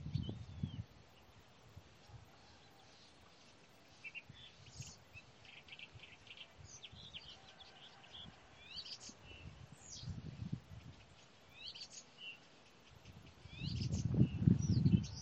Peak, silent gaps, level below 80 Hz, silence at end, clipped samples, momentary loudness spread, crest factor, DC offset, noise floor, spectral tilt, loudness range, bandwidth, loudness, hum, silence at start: -16 dBFS; none; -60 dBFS; 0 s; under 0.1%; 27 LU; 28 dB; under 0.1%; -64 dBFS; -6 dB/octave; 16 LU; 8.4 kHz; -42 LUFS; none; 0 s